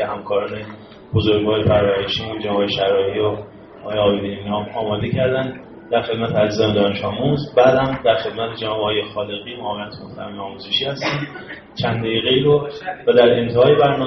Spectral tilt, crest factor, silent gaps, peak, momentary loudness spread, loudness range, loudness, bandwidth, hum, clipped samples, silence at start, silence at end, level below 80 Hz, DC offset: -4 dB/octave; 16 dB; none; -2 dBFS; 16 LU; 5 LU; -18 LUFS; 6.4 kHz; none; under 0.1%; 0 s; 0 s; -48 dBFS; under 0.1%